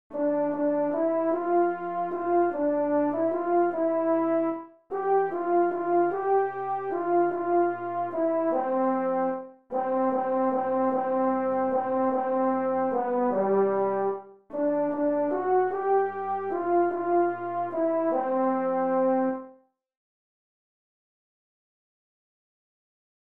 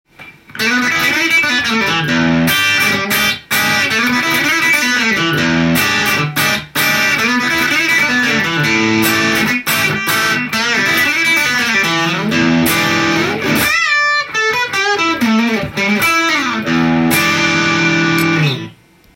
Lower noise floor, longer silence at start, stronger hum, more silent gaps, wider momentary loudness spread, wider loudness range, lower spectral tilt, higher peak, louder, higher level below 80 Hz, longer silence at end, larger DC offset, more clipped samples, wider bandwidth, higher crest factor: first, -56 dBFS vs -38 dBFS; about the same, 0.1 s vs 0.2 s; neither; neither; first, 6 LU vs 3 LU; about the same, 2 LU vs 1 LU; first, -10 dB/octave vs -3 dB/octave; second, -14 dBFS vs 0 dBFS; second, -26 LUFS vs -12 LUFS; second, -74 dBFS vs -48 dBFS; first, 3.7 s vs 0.4 s; first, 0.2% vs under 0.1%; neither; second, 3.3 kHz vs 17 kHz; about the same, 12 dB vs 14 dB